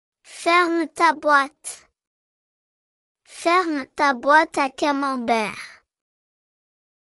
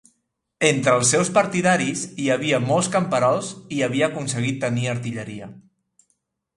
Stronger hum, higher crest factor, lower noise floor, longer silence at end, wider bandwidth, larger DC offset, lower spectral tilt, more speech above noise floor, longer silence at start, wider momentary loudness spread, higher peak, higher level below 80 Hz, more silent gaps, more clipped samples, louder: neither; about the same, 20 dB vs 20 dB; first, under -90 dBFS vs -73 dBFS; first, 1.4 s vs 0.95 s; about the same, 12 kHz vs 11.5 kHz; neither; second, -2.5 dB/octave vs -4 dB/octave; first, over 70 dB vs 52 dB; second, 0.3 s vs 0.6 s; first, 17 LU vs 12 LU; about the same, -4 dBFS vs -2 dBFS; second, -68 dBFS vs -60 dBFS; first, 2.07-3.15 s vs none; neither; about the same, -20 LUFS vs -21 LUFS